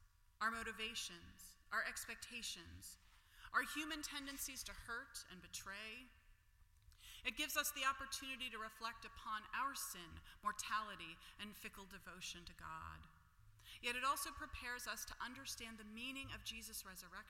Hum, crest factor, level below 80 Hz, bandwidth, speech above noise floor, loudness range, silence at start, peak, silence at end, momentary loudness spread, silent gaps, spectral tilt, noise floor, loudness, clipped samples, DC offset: none; 22 dB; -66 dBFS; 16.5 kHz; 23 dB; 5 LU; 0 s; -26 dBFS; 0 s; 15 LU; none; -1 dB/octave; -71 dBFS; -46 LUFS; under 0.1%; under 0.1%